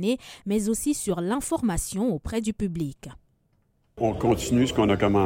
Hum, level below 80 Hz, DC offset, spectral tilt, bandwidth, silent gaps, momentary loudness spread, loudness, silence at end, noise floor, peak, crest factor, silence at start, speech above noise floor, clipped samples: none; -44 dBFS; under 0.1%; -5.5 dB/octave; 16.5 kHz; none; 9 LU; -26 LUFS; 0 s; -67 dBFS; -10 dBFS; 16 dB; 0 s; 43 dB; under 0.1%